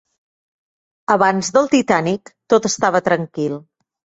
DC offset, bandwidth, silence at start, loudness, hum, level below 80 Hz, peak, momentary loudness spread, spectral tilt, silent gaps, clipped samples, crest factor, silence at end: under 0.1%; 8.2 kHz; 1.1 s; -17 LUFS; none; -58 dBFS; -2 dBFS; 10 LU; -4.5 dB/octave; none; under 0.1%; 18 dB; 0.6 s